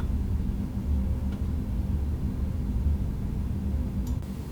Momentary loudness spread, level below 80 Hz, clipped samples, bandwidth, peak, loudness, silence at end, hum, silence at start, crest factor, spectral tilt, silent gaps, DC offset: 3 LU; -30 dBFS; under 0.1%; 16 kHz; -16 dBFS; -30 LUFS; 0 s; none; 0 s; 12 dB; -8.5 dB/octave; none; under 0.1%